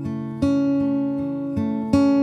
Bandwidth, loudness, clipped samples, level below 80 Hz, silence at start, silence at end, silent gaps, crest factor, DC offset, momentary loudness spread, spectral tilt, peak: 9.4 kHz; -22 LUFS; under 0.1%; -50 dBFS; 0 s; 0 s; none; 16 dB; under 0.1%; 7 LU; -8 dB/octave; -4 dBFS